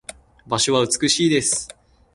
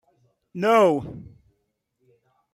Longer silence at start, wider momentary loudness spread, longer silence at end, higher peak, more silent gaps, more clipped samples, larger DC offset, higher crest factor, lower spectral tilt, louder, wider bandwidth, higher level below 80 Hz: about the same, 0.45 s vs 0.55 s; second, 15 LU vs 23 LU; second, 0.5 s vs 1.3 s; about the same, -4 dBFS vs -6 dBFS; neither; neither; neither; about the same, 18 dB vs 20 dB; second, -3 dB/octave vs -6 dB/octave; about the same, -19 LUFS vs -20 LUFS; second, 11.5 kHz vs 15.5 kHz; first, -54 dBFS vs -60 dBFS